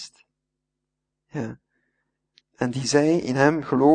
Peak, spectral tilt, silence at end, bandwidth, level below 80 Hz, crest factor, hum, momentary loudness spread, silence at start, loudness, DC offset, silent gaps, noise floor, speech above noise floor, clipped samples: -4 dBFS; -5.5 dB/octave; 0 s; 9.6 kHz; -64 dBFS; 22 dB; none; 16 LU; 0 s; -22 LUFS; under 0.1%; none; -82 dBFS; 62 dB; under 0.1%